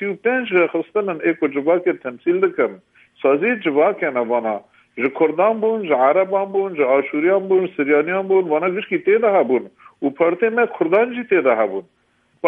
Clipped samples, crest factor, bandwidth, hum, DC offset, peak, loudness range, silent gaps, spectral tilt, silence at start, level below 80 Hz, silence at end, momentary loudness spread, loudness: under 0.1%; 16 dB; 3.8 kHz; none; under 0.1%; -2 dBFS; 2 LU; none; -9 dB/octave; 0 s; -72 dBFS; 0 s; 7 LU; -18 LUFS